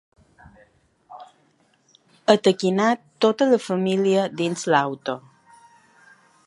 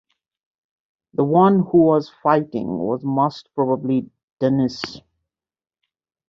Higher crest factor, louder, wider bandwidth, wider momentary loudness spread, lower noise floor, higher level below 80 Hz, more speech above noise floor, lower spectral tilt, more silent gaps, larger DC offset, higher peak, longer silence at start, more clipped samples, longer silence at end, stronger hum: about the same, 22 dB vs 18 dB; about the same, -21 LUFS vs -19 LUFS; first, 11.5 kHz vs 7.4 kHz; about the same, 9 LU vs 10 LU; second, -62 dBFS vs under -90 dBFS; second, -68 dBFS vs -60 dBFS; second, 42 dB vs over 72 dB; second, -5 dB/octave vs -8.5 dB/octave; second, none vs 4.23-4.37 s; neither; about the same, 0 dBFS vs -2 dBFS; about the same, 1.1 s vs 1.2 s; neither; about the same, 1.3 s vs 1.3 s; neither